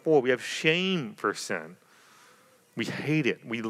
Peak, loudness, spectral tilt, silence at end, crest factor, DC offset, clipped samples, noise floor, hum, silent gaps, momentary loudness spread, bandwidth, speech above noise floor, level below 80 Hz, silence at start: -8 dBFS; -28 LUFS; -4.5 dB/octave; 0 s; 20 dB; under 0.1%; under 0.1%; -59 dBFS; none; none; 11 LU; 15 kHz; 32 dB; -86 dBFS; 0.05 s